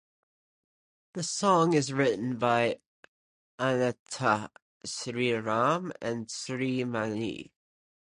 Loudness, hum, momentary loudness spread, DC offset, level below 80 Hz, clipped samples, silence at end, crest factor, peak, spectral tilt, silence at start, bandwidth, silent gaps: -29 LUFS; none; 11 LU; under 0.1%; -70 dBFS; under 0.1%; 0.7 s; 20 dB; -10 dBFS; -4.5 dB/octave; 1.15 s; 11 kHz; 2.87-3.58 s, 3.99-4.06 s, 4.62-4.80 s